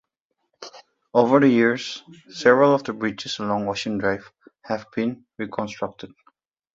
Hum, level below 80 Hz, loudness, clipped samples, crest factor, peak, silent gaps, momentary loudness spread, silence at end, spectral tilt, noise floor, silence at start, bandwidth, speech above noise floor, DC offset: none; -62 dBFS; -22 LUFS; under 0.1%; 22 dB; -2 dBFS; none; 24 LU; 0.7 s; -5.5 dB/octave; -77 dBFS; 0.6 s; 7.8 kHz; 56 dB; under 0.1%